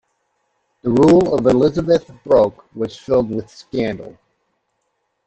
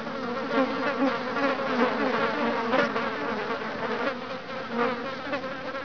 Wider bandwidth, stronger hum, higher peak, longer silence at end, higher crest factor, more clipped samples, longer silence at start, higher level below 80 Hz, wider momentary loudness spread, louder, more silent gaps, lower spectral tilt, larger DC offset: first, 8.4 kHz vs 5.4 kHz; neither; first, -2 dBFS vs -10 dBFS; first, 1.15 s vs 0 s; about the same, 16 dB vs 18 dB; neither; first, 0.85 s vs 0 s; first, -46 dBFS vs -66 dBFS; first, 15 LU vs 7 LU; first, -17 LUFS vs -28 LUFS; neither; first, -7.5 dB/octave vs -5.5 dB/octave; second, under 0.1% vs 0.4%